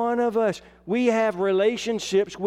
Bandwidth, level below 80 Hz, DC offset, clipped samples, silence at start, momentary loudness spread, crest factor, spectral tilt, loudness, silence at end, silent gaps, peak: 13 kHz; -60 dBFS; under 0.1%; under 0.1%; 0 s; 6 LU; 14 dB; -5 dB/octave; -23 LUFS; 0 s; none; -8 dBFS